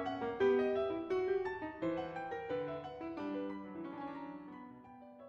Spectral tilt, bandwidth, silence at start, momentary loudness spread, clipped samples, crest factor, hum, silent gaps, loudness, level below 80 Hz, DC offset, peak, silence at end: -7.5 dB/octave; 6.6 kHz; 0 s; 17 LU; under 0.1%; 16 dB; none; none; -39 LUFS; -70 dBFS; under 0.1%; -22 dBFS; 0 s